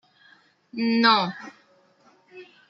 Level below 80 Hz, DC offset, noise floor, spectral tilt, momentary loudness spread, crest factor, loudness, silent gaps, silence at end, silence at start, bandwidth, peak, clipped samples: -76 dBFS; under 0.1%; -60 dBFS; -5.5 dB/octave; 23 LU; 22 dB; -21 LUFS; none; 0.25 s; 0.75 s; 6.6 kHz; -4 dBFS; under 0.1%